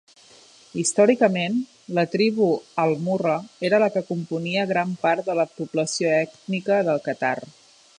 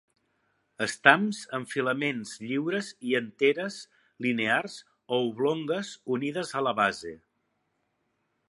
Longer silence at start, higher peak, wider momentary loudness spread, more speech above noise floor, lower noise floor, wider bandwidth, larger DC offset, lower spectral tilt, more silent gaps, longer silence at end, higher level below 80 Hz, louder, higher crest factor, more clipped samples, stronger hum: about the same, 0.75 s vs 0.8 s; about the same, -4 dBFS vs -2 dBFS; second, 8 LU vs 13 LU; second, 29 dB vs 48 dB; second, -51 dBFS vs -76 dBFS; about the same, 11.5 kHz vs 11.5 kHz; neither; about the same, -5 dB/octave vs -4.5 dB/octave; neither; second, 0.5 s vs 1.3 s; about the same, -72 dBFS vs -74 dBFS; first, -23 LUFS vs -28 LUFS; second, 20 dB vs 28 dB; neither; neither